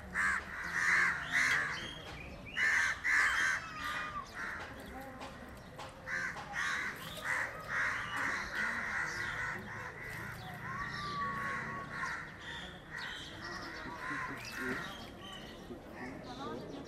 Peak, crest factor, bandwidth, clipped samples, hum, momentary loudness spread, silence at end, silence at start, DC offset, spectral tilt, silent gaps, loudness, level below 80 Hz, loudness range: -18 dBFS; 20 dB; 16 kHz; under 0.1%; none; 17 LU; 0 s; 0 s; under 0.1%; -2.5 dB/octave; none; -36 LUFS; -58 dBFS; 10 LU